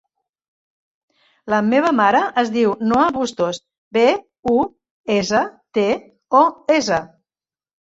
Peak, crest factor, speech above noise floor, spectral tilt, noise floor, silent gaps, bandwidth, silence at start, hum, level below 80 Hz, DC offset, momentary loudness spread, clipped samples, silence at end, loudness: -2 dBFS; 18 dB; over 73 dB; -4.5 dB/octave; under -90 dBFS; 3.78-3.91 s, 4.39-4.43 s, 4.91-5.04 s; 8 kHz; 1.45 s; none; -56 dBFS; under 0.1%; 8 LU; under 0.1%; 0.75 s; -18 LUFS